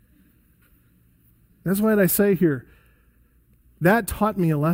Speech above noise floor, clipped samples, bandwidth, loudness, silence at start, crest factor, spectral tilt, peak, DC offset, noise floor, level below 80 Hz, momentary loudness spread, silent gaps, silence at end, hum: 39 dB; under 0.1%; 16.5 kHz; -21 LUFS; 1.65 s; 18 dB; -6.5 dB/octave; -6 dBFS; under 0.1%; -58 dBFS; -48 dBFS; 8 LU; none; 0 s; none